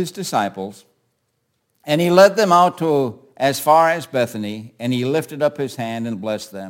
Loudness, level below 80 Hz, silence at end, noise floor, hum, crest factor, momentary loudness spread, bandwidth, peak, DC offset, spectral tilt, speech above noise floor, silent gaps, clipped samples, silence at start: -18 LUFS; -66 dBFS; 0 s; -70 dBFS; none; 18 dB; 15 LU; 17 kHz; 0 dBFS; under 0.1%; -5 dB/octave; 52 dB; none; under 0.1%; 0 s